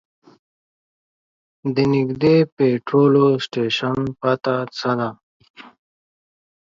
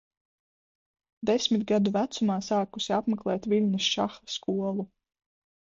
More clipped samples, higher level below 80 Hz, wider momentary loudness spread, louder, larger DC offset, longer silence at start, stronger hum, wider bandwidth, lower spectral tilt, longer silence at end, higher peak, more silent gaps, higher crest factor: neither; first, -58 dBFS vs -66 dBFS; about the same, 8 LU vs 7 LU; first, -19 LUFS vs -28 LUFS; neither; first, 1.65 s vs 1.2 s; neither; about the same, 7.6 kHz vs 7.6 kHz; first, -7.5 dB/octave vs -5 dB/octave; first, 1.05 s vs 0.8 s; first, -4 dBFS vs -12 dBFS; first, 2.52-2.57 s, 5.23-5.40 s, 5.50-5.54 s vs none; about the same, 18 dB vs 16 dB